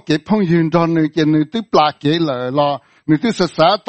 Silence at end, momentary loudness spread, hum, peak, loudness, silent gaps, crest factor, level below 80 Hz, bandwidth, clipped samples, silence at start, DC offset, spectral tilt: 0.1 s; 4 LU; none; 0 dBFS; -16 LUFS; none; 16 dB; -54 dBFS; 8.8 kHz; under 0.1%; 0.1 s; under 0.1%; -7 dB/octave